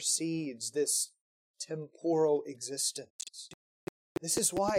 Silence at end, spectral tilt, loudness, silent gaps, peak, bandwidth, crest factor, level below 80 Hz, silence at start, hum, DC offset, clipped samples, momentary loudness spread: 0 s; -3 dB/octave; -32 LUFS; 1.21-1.54 s, 3.10-3.19 s, 3.54-4.15 s; -14 dBFS; 16.5 kHz; 18 dB; -70 dBFS; 0 s; none; under 0.1%; under 0.1%; 18 LU